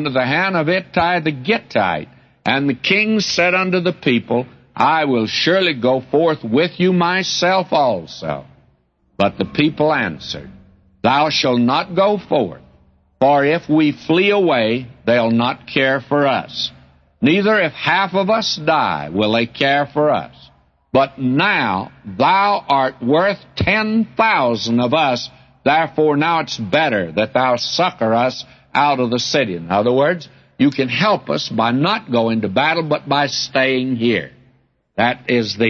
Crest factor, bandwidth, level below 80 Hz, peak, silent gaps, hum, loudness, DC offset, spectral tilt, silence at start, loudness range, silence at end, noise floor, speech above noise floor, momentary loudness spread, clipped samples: 16 dB; 7.2 kHz; -52 dBFS; -2 dBFS; none; none; -17 LUFS; under 0.1%; -5 dB/octave; 0 s; 2 LU; 0 s; -59 dBFS; 42 dB; 6 LU; under 0.1%